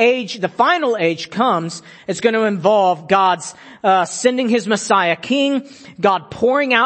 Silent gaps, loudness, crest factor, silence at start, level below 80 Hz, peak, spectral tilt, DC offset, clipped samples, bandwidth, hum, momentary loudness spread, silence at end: none; -17 LUFS; 16 dB; 0 s; -62 dBFS; 0 dBFS; -4 dB/octave; under 0.1%; under 0.1%; 8.8 kHz; none; 8 LU; 0 s